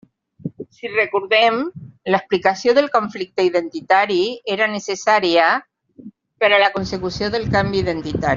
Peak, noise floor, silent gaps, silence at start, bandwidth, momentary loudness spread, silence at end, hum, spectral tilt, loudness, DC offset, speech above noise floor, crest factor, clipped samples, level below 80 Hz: -2 dBFS; -42 dBFS; none; 0.45 s; 7.6 kHz; 10 LU; 0 s; none; -5 dB/octave; -18 LUFS; under 0.1%; 24 dB; 18 dB; under 0.1%; -48 dBFS